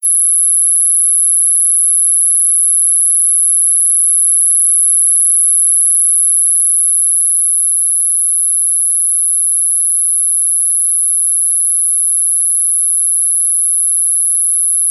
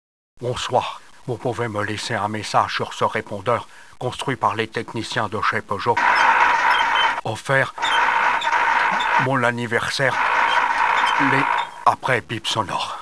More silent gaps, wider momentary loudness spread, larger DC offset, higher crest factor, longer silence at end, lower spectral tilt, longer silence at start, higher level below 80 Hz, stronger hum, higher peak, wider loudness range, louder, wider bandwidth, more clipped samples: neither; second, 2 LU vs 9 LU; second, under 0.1% vs 0.4%; second, 8 dB vs 20 dB; about the same, 0 s vs 0 s; second, 8.5 dB/octave vs -4 dB/octave; second, 0 s vs 0.4 s; second, under -90 dBFS vs -56 dBFS; neither; about the same, -2 dBFS vs 0 dBFS; second, 2 LU vs 6 LU; first, -8 LUFS vs -20 LUFS; first, over 20 kHz vs 11 kHz; neither